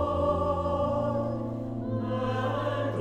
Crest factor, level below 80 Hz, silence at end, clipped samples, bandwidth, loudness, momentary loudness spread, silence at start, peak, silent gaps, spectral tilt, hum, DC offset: 14 dB; -48 dBFS; 0 s; under 0.1%; 9.4 kHz; -29 LUFS; 6 LU; 0 s; -14 dBFS; none; -8.5 dB/octave; none; under 0.1%